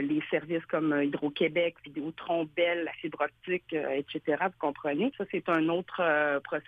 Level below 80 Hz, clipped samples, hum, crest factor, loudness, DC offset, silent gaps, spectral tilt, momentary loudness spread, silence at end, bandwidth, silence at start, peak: -72 dBFS; under 0.1%; none; 16 dB; -30 LUFS; under 0.1%; none; -8 dB/octave; 6 LU; 0.05 s; 4.8 kHz; 0 s; -14 dBFS